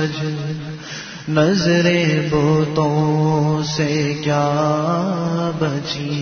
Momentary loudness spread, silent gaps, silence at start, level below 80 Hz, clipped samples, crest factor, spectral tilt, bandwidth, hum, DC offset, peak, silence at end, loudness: 11 LU; none; 0 s; -48 dBFS; under 0.1%; 16 dB; -6 dB/octave; 6.6 kHz; none; under 0.1%; -2 dBFS; 0 s; -18 LUFS